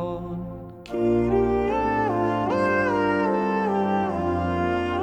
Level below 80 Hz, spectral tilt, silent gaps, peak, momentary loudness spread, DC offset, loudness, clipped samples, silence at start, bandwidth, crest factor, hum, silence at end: -44 dBFS; -8 dB/octave; none; -10 dBFS; 11 LU; under 0.1%; -23 LUFS; under 0.1%; 0 s; 8.8 kHz; 12 dB; none; 0 s